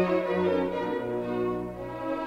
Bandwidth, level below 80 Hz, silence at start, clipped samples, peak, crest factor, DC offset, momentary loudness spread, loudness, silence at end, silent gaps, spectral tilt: 9 kHz; -54 dBFS; 0 s; under 0.1%; -14 dBFS; 14 dB; under 0.1%; 8 LU; -29 LUFS; 0 s; none; -8 dB/octave